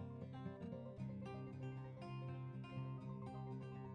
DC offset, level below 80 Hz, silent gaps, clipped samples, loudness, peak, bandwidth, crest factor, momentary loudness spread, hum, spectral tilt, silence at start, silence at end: under 0.1%; -72 dBFS; none; under 0.1%; -51 LUFS; -36 dBFS; 6.2 kHz; 12 dB; 2 LU; none; -9 dB/octave; 0 s; 0 s